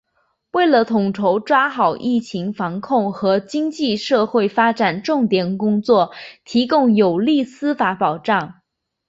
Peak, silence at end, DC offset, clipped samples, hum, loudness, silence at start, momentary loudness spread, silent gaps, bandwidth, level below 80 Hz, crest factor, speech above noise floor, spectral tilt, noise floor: -2 dBFS; 0.55 s; under 0.1%; under 0.1%; none; -18 LUFS; 0.55 s; 8 LU; none; 7.8 kHz; -60 dBFS; 16 dB; 49 dB; -6.5 dB/octave; -67 dBFS